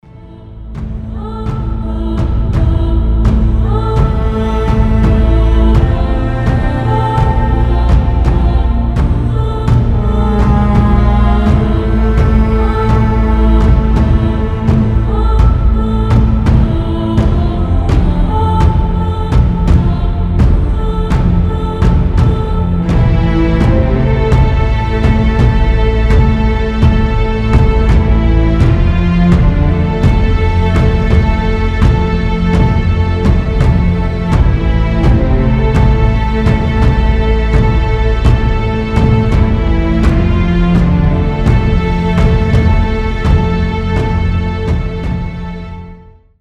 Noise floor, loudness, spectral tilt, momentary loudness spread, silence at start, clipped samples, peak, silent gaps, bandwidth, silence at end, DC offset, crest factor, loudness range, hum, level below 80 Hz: -36 dBFS; -12 LUFS; -8.5 dB/octave; 4 LU; 0.15 s; under 0.1%; 0 dBFS; none; 7 kHz; 0.45 s; under 0.1%; 10 dB; 2 LU; none; -12 dBFS